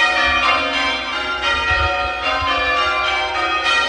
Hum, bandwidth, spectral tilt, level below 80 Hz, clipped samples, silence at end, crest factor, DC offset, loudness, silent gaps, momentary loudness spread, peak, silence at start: none; 11.5 kHz; -2.5 dB/octave; -36 dBFS; under 0.1%; 0 s; 16 dB; under 0.1%; -17 LUFS; none; 5 LU; -2 dBFS; 0 s